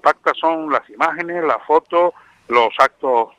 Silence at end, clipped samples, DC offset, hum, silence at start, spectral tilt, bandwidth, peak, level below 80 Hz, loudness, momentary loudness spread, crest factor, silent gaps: 0.1 s; under 0.1%; under 0.1%; none; 0.05 s; -4 dB/octave; 10.5 kHz; 0 dBFS; -66 dBFS; -17 LUFS; 5 LU; 18 dB; none